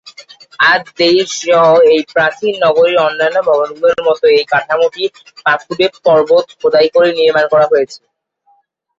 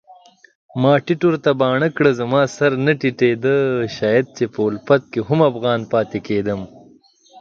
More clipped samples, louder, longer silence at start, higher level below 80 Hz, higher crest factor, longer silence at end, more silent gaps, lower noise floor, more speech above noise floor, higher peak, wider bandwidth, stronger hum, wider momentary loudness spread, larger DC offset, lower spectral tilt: neither; first, -11 LUFS vs -18 LUFS; about the same, 0.05 s vs 0.1 s; about the same, -56 dBFS vs -56 dBFS; second, 12 dB vs 18 dB; first, 1.05 s vs 0 s; second, none vs 0.55-0.69 s; first, -56 dBFS vs -50 dBFS; first, 45 dB vs 33 dB; about the same, 0 dBFS vs 0 dBFS; about the same, 7.8 kHz vs 7.6 kHz; neither; about the same, 6 LU vs 6 LU; neither; second, -3.5 dB/octave vs -7 dB/octave